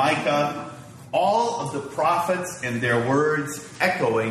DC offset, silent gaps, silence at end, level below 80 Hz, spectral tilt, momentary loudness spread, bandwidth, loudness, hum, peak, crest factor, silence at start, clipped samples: under 0.1%; none; 0 s; -62 dBFS; -5 dB/octave; 9 LU; 14 kHz; -23 LUFS; none; -6 dBFS; 18 dB; 0 s; under 0.1%